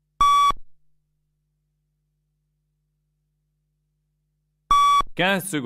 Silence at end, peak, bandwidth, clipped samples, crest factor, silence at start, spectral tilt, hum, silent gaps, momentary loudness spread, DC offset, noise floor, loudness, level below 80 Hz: 0 s; -8 dBFS; 16 kHz; under 0.1%; 16 dB; 0.2 s; -3 dB/octave; 50 Hz at -70 dBFS; none; 5 LU; under 0.1%; -73 dBFS; -19 LUFS; -44 dBFS